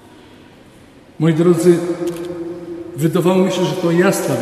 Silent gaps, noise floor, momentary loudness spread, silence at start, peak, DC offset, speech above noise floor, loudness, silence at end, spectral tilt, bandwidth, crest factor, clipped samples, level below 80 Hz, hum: none; -43 dBFS; 14 LU; 1.2 s; 0 dBFS; under 0.1%; 29 dB; -16 LUFS; 0 s; -6.5 dB/octave; 13.5 kHz; 16 dB; under 0.1%; -56 dBFS; none